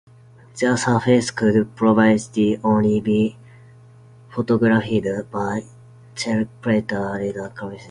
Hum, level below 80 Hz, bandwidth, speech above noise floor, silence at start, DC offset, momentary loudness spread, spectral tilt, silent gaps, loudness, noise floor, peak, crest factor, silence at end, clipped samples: none; -52 dBFS; 10.5 kHz; 28 dB; 0.55 s; under 0.1%; 12 LU; -6 dB/octave; none; -20 LUFS; -47 dBFS; -2 dBFS; 18 dB; 0 s; under 0.1%